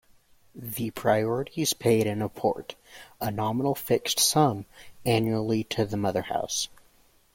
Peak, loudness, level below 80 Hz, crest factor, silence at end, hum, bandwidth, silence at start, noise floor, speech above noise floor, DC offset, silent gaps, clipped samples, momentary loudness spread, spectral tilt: -8 dBFS; -27 LUFS; -60 dBFS; 20 dB; 0.7 s; none; 16.5 kHz; 0.55 s; -61 dBFS; 34 dB; under 0.1%; none; under 0.1%; 14 LU; -4 dB/octave